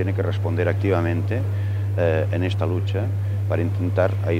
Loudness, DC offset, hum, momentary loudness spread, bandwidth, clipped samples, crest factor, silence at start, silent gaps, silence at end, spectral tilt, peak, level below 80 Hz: -22 LUFS; under 0.1%; none; 3 LU; 6 kHz; under 0.1%; 16 dB; 0 s; none; 0 s; -8.5 dB/octave; -6 dBFS; -50 dBFS